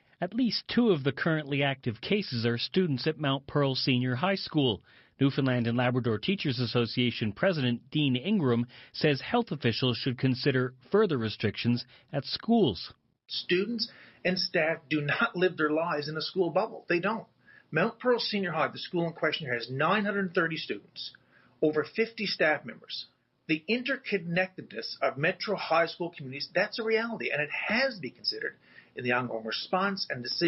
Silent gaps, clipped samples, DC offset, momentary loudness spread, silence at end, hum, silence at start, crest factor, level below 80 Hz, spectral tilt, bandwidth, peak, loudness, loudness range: none; under 0.1%; under 0.1%; 8 LU; 0 s; none; 0.2 s; 16 dB; -64 dBFS; -8 dB/octave; 6 kHz; -14 dBFS; -29 LUFS; 2 LU